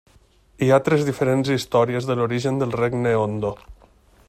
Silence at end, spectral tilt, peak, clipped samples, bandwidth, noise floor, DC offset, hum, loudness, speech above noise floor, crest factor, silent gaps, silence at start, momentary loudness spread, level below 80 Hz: 0.55 s; -6.5 dB/octave; -4 dBFS; under 0.1%; 15 kHz; -55 dBFS; under 0.1%; none; -21 LUFS; 35 dB; 18 dB; none; 0.6 s; 7 LU; -52 dBFS